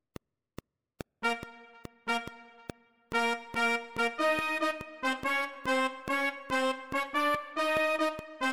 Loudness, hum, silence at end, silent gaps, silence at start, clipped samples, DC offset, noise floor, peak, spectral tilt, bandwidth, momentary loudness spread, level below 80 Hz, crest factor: -31 LUFS; none; 0 s; none; 1.2 s; under 0.1%; under 0.1%; -53 dBFS; -16 dBFS; -3 dB/octave; 17 kHz; 19 LU; -62 dBFS; 16 dB